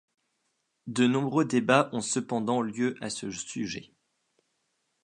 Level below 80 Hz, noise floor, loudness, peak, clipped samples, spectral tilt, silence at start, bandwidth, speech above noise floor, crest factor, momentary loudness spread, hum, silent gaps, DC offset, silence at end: -70 dBFS; -77 dBFS; -28 LUFS; -6 dBFS; under 0.1%; -4.5 dB/octave; 0.85 s; 11 kHz; 50 dB; 24 dB; 12 LU; none; none; under 0.1%; 1.2 s